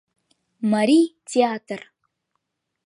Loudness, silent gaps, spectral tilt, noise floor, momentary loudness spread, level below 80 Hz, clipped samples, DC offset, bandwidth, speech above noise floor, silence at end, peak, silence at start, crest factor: -21 LUFS; none; -5 dB/octave; -77 dBFS; 16 LU; -78 dBFS; under 0.1%; under 0.1%; 11 kHz; 57 dB; 1.1 s; -6 dBFS; 0.6 s; 18 dB